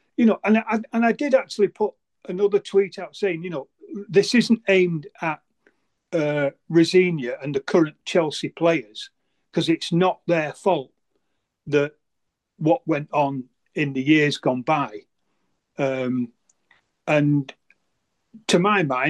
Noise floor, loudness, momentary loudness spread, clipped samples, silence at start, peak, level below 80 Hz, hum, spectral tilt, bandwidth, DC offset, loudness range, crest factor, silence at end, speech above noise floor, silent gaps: -78 dBFS; -22 LUFS; 14 LU; under 0.1%; 0.2 s; -4 dBFS; -72 dBFS; none; -6 dB/octave; 12 kHz; under 0.1%; 4 LU; 18 dB; 0 s; 56 dB; none